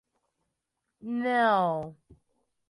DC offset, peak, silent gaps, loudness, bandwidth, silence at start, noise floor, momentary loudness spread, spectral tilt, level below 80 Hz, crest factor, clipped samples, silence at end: under 0.1%; -12 dBFS; none; -27 LUFS; 11 kHz; 1.05 s; -83 dBFS; 19 LU; -6.5 dB/octave; -70 dBFS; 18 dB; under 0.1%; 0.75 s